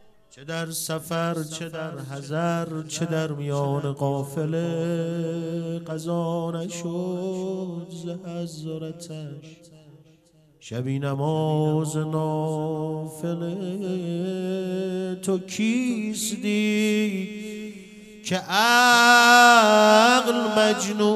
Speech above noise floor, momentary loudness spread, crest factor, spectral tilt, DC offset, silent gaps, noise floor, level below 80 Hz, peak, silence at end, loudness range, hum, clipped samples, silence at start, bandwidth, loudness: 34 dB; 18 LU; 22 dB; -4.5 dB/octave; under 0.1%; none; -57 dBFS; -68 dBFS; -2 dBFS; 0 s; 15 LU; none; under 0.1%; 0.35 s; 15.5 kHz; -22 LUFS